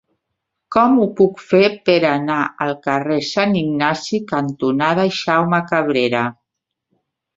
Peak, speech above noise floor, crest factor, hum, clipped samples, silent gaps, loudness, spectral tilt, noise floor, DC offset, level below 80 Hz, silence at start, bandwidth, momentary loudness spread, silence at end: -2 dBFS; 63 dB; 16 dB; none; under 0.1%; none; -17 LUFS; -6 dB/octave; -79 dBFS; under 0.1%; -58 dBFS; 0.7 s; 7.8 kHz; 7 LU; 1.05 s